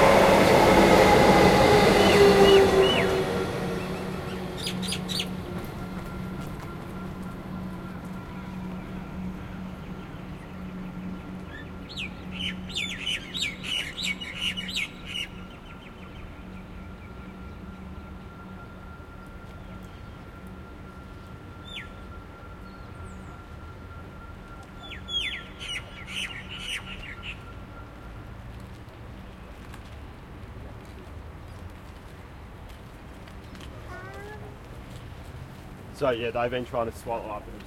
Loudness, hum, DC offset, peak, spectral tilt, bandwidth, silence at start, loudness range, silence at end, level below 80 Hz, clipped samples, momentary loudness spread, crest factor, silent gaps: -24 LUFS; none; under 0.1%; -4 dBFS; -5 dB/octave; 16.5 kHz; 0 s; 22 LU; 0 s; -44 dBFS; under 0.1%; 26 LU; 22 dB; none